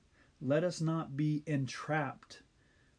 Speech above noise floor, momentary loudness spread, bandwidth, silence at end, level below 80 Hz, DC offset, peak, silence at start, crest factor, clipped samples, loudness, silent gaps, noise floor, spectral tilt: 33 dB; 17 LU; 10 kHz; 0.6 s; -72 dBFS; under 0.1%; -18 dBFS; 0.4 s; 18 dB; under 0.1%; -35 LUFS; none; -68 dBFS; -6.5 dB/octave